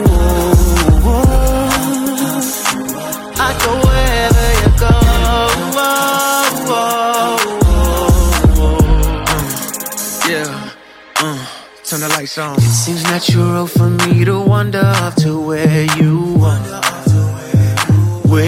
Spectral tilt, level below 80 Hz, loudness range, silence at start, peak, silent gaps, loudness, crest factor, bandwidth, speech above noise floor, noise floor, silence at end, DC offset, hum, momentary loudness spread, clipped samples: -5 dB/octave; -18 dBFS; 4 LU; 0 s; 0 dBFS; none; -13 LUFS; 12 dB; 17 kHz; 22 dB; -34 dBFS; 0 s; under 0.1%; none; 8 LU; under 0.1%